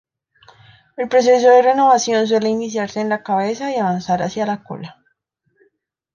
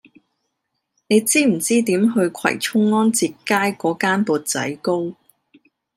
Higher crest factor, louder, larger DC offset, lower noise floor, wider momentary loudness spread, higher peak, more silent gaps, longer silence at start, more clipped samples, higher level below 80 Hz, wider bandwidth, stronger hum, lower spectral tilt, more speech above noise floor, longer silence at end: about the same, 16 dB vs 16 dB; about the same, -16 LUFS vs -18 LUFS; neither; second, -67 dBFS vs -76 dBFS; first, 16 LU vs 6 LU; about the same, -2 dBFS vs -4 dBFS; neither; about the same, 1 s vs 1.1 s; neither; first, -62 dBFS vs -70 dBFS; second, 7.4 kHz vs 16 kHz; neither; about the same, -4.5 dB/octave vs -4 dB/octave; second, 51 dB vs 57 dB; first, 1.25 s vs 0.85 s